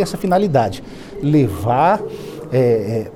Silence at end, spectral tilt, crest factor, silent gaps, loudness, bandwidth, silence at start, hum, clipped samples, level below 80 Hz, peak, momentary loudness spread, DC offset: 0 s; -7.5 dB/octave; 14 dB; none; -17 LUFS; 17 kHz; 0 s; none; under 0.1%; -44 dBFS; -4 dBFS; 14 LU; under 0.1%